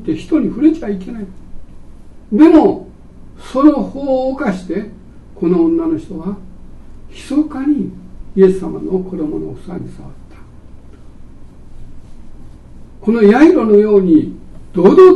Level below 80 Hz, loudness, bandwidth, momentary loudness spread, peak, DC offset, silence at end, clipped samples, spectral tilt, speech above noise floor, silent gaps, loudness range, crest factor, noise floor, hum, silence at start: -36 dBFS; -13 LUFS; 9.2 kHz; 19 LU; 0 dBFS; under 0.1%; 0 s; 0.4%; -8.5 dB/octave; 23 dB; none; 13 LU; 14 dB; -35 dBFS; none; 0 s